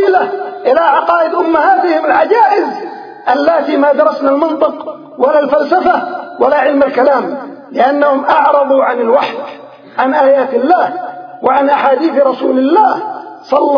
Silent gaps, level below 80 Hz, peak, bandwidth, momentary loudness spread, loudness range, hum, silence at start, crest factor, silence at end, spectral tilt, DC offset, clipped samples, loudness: none; -56 dBFS; 0 dBFS; 5.4 kHz; 12 LU; 1 LU; none; 0 s; 12 dB; 0 s; -6 dB/octave; under 0.1%; 0.1%; -11 LUFS